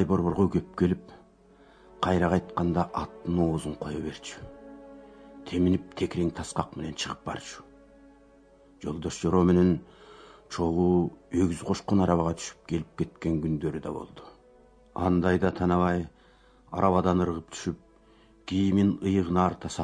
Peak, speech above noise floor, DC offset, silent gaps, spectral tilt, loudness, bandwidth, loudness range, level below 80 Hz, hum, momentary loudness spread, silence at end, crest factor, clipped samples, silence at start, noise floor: -8 dBFS; 31 dB; under 0.1%; none; -7 dB/octave; -28 LUFS; 10.5 kHz; 5 LU; -50 dBFS; none; 16 LU; 0 s; 20 dB; under 0.1%; 0 s; -58 dBFS